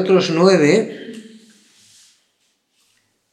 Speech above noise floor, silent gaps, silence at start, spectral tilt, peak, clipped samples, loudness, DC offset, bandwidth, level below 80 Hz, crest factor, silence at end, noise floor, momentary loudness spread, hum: 52 dB; none; 0 s; -5.5 dB/octave; 0 dBFS; under 0.1%; -15 LUFS; under 0.1%; 10 kHz; -80 dBFS; 18 dB; 2.1 s; -66 dBFS; 23 LU; none